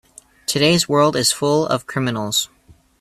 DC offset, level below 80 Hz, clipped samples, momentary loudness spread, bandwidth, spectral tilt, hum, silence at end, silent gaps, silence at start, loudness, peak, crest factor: under 0.1%; -54 dBFS; under 0.1%; 8 LU; 16 kHz; -3.5 dB/octave; none; 0.55 s; none; 0.5 s; -18 LUFS; -2 dBFS; 18 dB